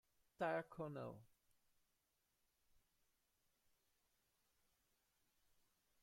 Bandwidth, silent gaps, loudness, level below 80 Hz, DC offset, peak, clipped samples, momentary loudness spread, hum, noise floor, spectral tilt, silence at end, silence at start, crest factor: 16 kHz; none; -48 LUFS; -86 dBFS; under 0.1%; -32 dBFS; under 0.1%; 11 LU; none; -87 dBFS; -7 dB/octave; 4.75 s; 0.4 s; 24 dB